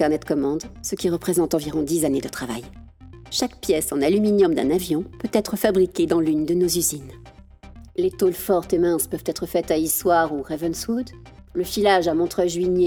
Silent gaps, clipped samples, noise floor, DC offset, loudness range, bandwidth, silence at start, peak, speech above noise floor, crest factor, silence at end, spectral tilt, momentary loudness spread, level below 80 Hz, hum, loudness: none; under 0.1%; -44 dBFS; under 0.1%; 3 LU; over 20 kHz; 0 s; -4 dBFS; 23 dB; 18 dB; 0 s; -4.5 dB/octave; 10 LU; -46 dBFS; none; -22 LUFS